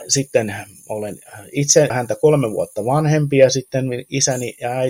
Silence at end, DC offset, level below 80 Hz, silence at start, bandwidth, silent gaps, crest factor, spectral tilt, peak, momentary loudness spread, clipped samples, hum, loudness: 0 s; under 0.1%; -56 dBFS; 0 s; 16.5 kHz; none; 18 dB; -4.5 dB/octave; 0 dBFS; 14 LU; under 0.1%; none; -18 LUFS